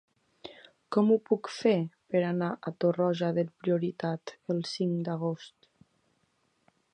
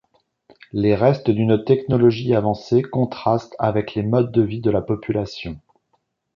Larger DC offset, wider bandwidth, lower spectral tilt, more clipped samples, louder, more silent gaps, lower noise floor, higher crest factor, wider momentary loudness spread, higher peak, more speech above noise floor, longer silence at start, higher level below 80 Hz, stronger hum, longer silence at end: neither; first, 9.6 kHz vs 7 kHz; second, -7 dB/octave vs -9 dB/octave; neither; second, -30 LUFS vs -20 LUFS; neither; first, -73 dBFS vs -69 dBFS; about the same, 20 dB vs 18 dB; first, 12 LU vs 8 LU; second, -12 dBFS vs -2 dBFS; second, 44 dB vs 50 dB; second, 0.45 s vs 0.75 s; second, -78 dBFS vs -48 dBFS; neither; first, 1.45 s vs 0.75 s